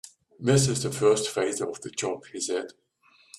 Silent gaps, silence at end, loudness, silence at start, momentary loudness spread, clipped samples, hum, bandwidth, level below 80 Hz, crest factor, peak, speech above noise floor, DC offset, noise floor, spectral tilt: none; 0.65 s; -26 LUFS; 0.05 s; 10 LU; under 0.1%; none; 13.5 kHz; -60 dBFS; 18 dB; -8 dBFS; 29 dB; under 0.1%; -55 dBFS; -4.5 dB/octave